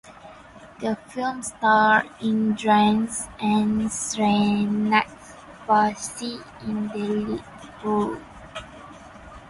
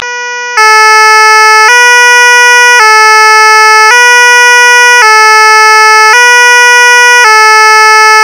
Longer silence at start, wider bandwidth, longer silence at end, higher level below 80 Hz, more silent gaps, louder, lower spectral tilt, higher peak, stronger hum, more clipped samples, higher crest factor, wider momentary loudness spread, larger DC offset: about the same, 0.05 s vs 0 s; second, 11.5 kHz vs over 20 kHz; about the same, 0 s vs 0 s; first, -54 dBFS vs -74 dBFS; neither; second, -23 LUFS vs 0 LUFS; first, -4.5 dB/octave vs 4.5 dB/octave; second, -6 dBFS vs 0 dBFS; neither; second, under 0.1% vs 30%; first, 18 dB vs 2 dB; first, 20 LU vs 0 LU; second, under 0.1% vs 0.2%